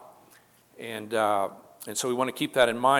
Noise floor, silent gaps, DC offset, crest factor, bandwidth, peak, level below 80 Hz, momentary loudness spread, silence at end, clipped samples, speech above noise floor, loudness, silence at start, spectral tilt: -58 dBFS; none; under 0.1%; 20 dB; 18.5 kHz; -6 dBFS; -72 dBFS; 14 LU; 0 s; under 0.1%; 32 dB; -27 LUFS; 0.05 s; -3 dB/octave